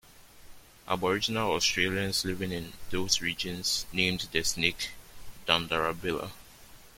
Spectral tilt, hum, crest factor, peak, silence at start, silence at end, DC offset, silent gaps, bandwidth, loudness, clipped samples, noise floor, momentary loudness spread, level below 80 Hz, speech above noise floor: -2.5 dB/octave; none; 24 dB; -6 dBFS; 0.1 s; 0.05 s; under 0.1%; none; 16.5 kHz; -29 LUFS; under 0.1%; -52 dBFS; 10 LU; -52 dBFS; 22 dB